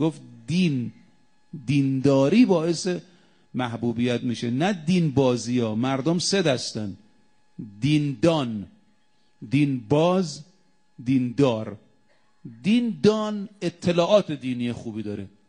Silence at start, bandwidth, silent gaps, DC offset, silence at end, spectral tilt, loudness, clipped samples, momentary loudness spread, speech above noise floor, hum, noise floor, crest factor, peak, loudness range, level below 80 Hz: 0 s; 10 kHz; none; under 0.1%; 0.2 s; -6 dB/octave; -23 LUFS; under 0.1%; 14 LU; 44 dB; none; -67 dBFS; 18 dB; -6 dBFS; 2 LU; -62 dBFS